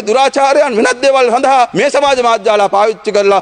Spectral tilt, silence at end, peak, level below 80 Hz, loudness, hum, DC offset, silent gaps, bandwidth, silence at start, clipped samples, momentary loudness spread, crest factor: -3 dB/octave; 0 s; 0 dBFS; -52 dBFS; -10 LUFS; none; under 0.1%; none; 9.8 kHz; 0 s; under 0.1%; 2 LU; 10 dB